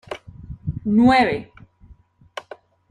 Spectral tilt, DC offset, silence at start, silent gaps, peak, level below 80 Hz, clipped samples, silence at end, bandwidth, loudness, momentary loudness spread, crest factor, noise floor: -7 dB/octave; under 0.1%; 0.1 s; none; -4 dBFS; -46 dBFS; under 0.1%; 0.5 s; 10 kHz; -18 LUFS; 23 LU; 18 dB; -51 dBFS